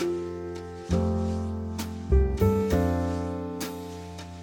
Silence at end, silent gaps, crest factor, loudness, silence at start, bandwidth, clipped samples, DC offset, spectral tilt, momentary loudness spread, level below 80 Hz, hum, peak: 0 s; none; 16 dB; -28 LUFS; 0 s; 17.5 kHz; under 0.1%; under 0.1%; -7.5 dB/octave; 14 LU; -34 dBFS; none; -10 dBFS